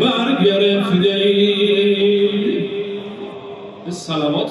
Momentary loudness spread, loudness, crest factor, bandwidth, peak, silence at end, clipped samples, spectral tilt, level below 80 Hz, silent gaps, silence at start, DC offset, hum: 16 LU; -16 LUFS; 14 dB; 11 kHz; -2 dBFS; 0 s; under 0.1%; -6 dB/octave; -62 dBFS; none; 0 s; under 0.1%; none